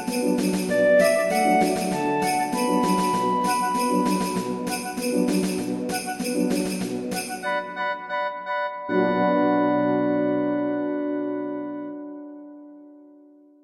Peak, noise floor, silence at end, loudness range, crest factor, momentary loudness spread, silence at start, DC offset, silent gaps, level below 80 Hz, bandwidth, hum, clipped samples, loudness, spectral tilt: -8 dBFS; -51 dBFS; 0.55 s; 6 LU; 16 dB; 9 LU; 0 s; under 0.1%; none; -60 dBFS; 16 kHz; none; under 0.1%; -23 LUFS; -5 dB/octave